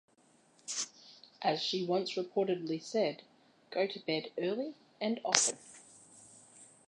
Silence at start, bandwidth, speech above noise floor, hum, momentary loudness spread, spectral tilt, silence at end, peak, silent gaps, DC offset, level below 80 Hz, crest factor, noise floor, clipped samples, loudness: 0.65 s; 11 kHz; 33 dB; none; 25 LU; -2.5 dB/octave; 0.2 s; -2 dBFS; none; under 0.1%; -88 dBFS; 34 dB; -67 dBFS; under 0.1%; -34 LUFS